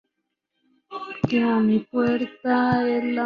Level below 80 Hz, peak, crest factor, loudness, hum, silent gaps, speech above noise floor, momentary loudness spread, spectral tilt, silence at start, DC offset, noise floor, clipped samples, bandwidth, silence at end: -58 dBFS; -8 dBFS; 16 dB; -22 LUFS; none; none; 58 dB; 13 LU; -8 dB/octave; 0.9 s; under 0.1%; -79 dBFS; under 0.1%; 6.4 kHz; 0 s